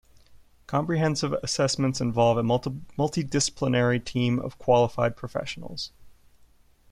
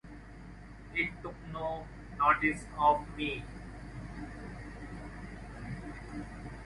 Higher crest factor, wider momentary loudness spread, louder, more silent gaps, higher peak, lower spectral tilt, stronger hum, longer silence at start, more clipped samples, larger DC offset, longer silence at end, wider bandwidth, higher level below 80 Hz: about the same, 18 dB vs 22 dB; second, 12 LU vs 19 LU; first, -26 LUFS vs -34 LUFS; neither; first, -8 dBFS vs -12 dBFS; about the same, -5 dB/octave vs -6 dB/octave; neither; first, 0.3 s vs 0.05 s; neither; neither; first, 0.8 s vs 0 s; about the same, 12.5 kHz vs 11.5 kHz; about the same, -54 dBFS vs -50 dBFS